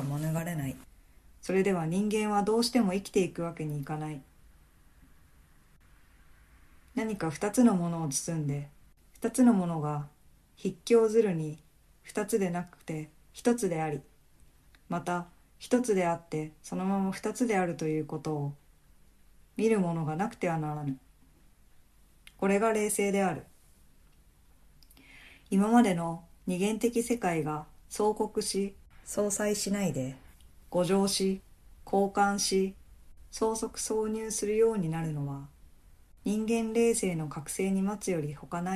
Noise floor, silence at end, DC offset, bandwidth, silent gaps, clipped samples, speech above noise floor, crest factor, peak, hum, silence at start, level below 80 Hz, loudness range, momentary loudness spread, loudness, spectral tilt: -60 dBFS; 0 s; under 0.1%; 14 kHz; none; under 0.1%; 31 dB; 20 dB; -12 dBFS; none; 0 s; -60 dBFS; 5 LU; 13 LU; -30 LUFS; -5.5 dB/octave